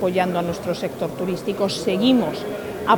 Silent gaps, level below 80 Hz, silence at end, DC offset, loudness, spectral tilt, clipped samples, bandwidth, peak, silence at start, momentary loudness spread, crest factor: none; -54 dBFS; 0 s; under 0.1%; -22 LUFS; -5.5 dB/octave; under 0.1%; 19 kHz; -4 dBFS; 0 s; 9 LU; 18 dB